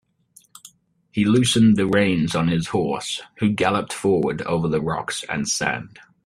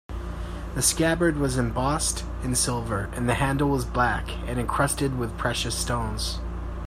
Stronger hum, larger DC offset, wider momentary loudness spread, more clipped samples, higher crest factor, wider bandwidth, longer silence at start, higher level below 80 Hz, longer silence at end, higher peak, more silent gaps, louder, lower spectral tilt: neither; neither; about the same, 10 LU vs 10 LU; neither; about the same, 18 dB vs 18 dB; second, 13.5 kHz vs 16 kHz; first, 0.65 s vs 0.1 s; second, -52 dBFS vs -34 dBFS; first, 0.4 s vs 0 s; first, -4 dBFS vs -8 dBFS; neither; first, -21 LUFS vs -25 LUFS; about the same, -5 dB/octave vs -4 dB/octave